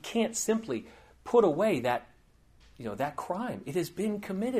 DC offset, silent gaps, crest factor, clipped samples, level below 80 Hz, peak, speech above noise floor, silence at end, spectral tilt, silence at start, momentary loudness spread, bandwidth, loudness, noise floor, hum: under 0.1%; none; 18 dB; under 0.1%; -62 dBFS; -12 dBFS; 31 dB; 0 s; -5 dB/octave; 0.05 s; 12 LU; 15.5 kHz; -30 LUFS; -61 dBFS; none